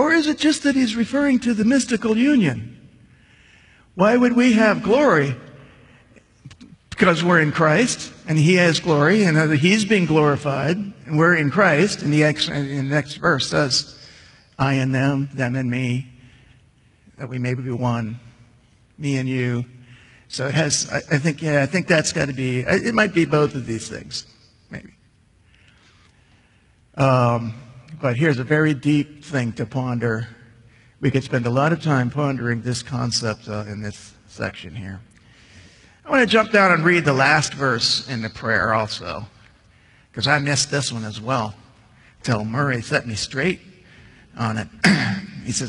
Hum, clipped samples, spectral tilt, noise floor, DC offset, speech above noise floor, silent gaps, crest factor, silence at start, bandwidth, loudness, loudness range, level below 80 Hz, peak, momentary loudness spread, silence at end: none; under 0.1%; -5 dB/octave; -56 dBFS; under 0.1%; 37 dB; none; 20 dB; 0 s; 11 kHz; -19 LUFS; 9 LU; -54 dBFS; 0 dBFS; 15 LU; 0 s